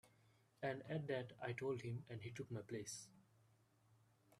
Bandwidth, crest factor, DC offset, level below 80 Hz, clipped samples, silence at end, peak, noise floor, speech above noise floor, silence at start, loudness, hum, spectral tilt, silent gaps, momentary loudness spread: 13.5 kHz; 18 dB; under 0.1%; -82 dBFS; under 0.1%; 0.05 s; -32 dBFS; -76 dBFS; 28 dB; 0.05 s; -48 LUFS; none; -5.5 dB/octave; none; 7 LU